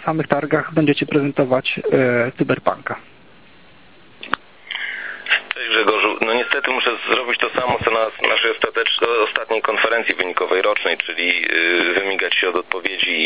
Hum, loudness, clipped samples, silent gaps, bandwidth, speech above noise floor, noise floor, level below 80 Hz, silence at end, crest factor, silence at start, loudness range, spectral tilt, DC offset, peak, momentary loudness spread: none; -18 LUFS; under 0.1%; none; 4 kHz; 29 dB; -48 dBFS; -56 dBFS; 0 s; 20 dB; 0 s; 5 LU; -8 dB/octave; 0.4%; 0 dBFS; 9 LU